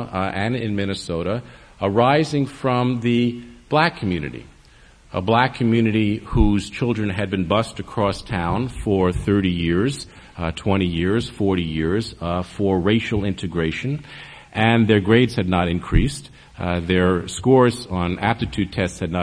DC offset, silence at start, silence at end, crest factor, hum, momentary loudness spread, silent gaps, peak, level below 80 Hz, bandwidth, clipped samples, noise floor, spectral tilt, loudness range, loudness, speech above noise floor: under 0.1%; 0 s; 0 s; 20 dB; none; 10 LU; none; -2 dBFS; -34 dBFS; 10.5 kHz; under 0.1%; -49 dBFS; -6.5 dB/octave; 3 LU; -21 LUFS; 29 dB